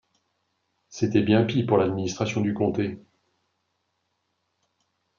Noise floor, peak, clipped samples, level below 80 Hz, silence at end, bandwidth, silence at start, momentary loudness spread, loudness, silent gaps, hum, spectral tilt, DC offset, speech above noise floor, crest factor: -76 dBFS; -6 dBFS; under 0.1%; -66 dBFS; 2.2 s; 7.4 kHz; 0.9 s; 10 LU; -24 LUFS; none; none; -6.5 dB/octave; under 0.1%; 53 dB; 20 dB